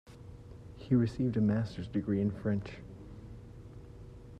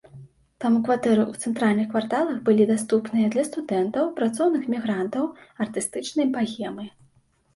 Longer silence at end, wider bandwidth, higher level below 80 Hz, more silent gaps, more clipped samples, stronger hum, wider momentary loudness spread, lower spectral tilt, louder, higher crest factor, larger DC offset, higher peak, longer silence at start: second, 0 s vs 0.65 s; second, 9 kHz vs 11.5 kHz; first, -54 dBFS vs -66 dBFS; neither; neither; neither; first, 21 LU vs 9 LU; first, -9 dB/octave vs -5.5 dB/octave; second, -32 LUFS vs -24 LUFS; about the same, 18 dB vs 16 dB; neither; second, -16 dBFS vs -8 dBFS; about the same, 0.05 s vs 0.15 s